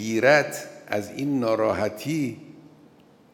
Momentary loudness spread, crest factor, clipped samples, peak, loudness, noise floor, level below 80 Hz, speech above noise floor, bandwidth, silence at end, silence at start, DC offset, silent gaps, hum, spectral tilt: 13 LU; 22 dB; under 0.1%; -2 dBFS; -24 LUFS; -54 dBFS; -70 dBFS; 30 dB; over 20 kHz; 0.75 s; 0 s; under 0.1%; none; none; -5 dB/octave